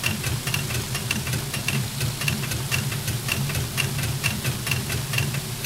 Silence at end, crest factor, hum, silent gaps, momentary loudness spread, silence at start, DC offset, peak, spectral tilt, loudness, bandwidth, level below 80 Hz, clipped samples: 0 s; 20 dB; none; none; 2 LU; 0 s; under 0.1%; -6 dBFS; -3.5 dB/octave; -25 LUFS; 18 kHz; -44 dBFS; under 0.1%